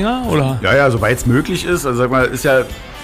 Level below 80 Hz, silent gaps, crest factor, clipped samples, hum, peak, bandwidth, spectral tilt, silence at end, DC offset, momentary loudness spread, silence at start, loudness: -32 dBFS; none; 12 dB; under 0.1%; none; -4 dBFS; 16 kHz; -5.5 dB/octave; 0 s; under 0.1%; 5 LU; 0 s; -15 LUFS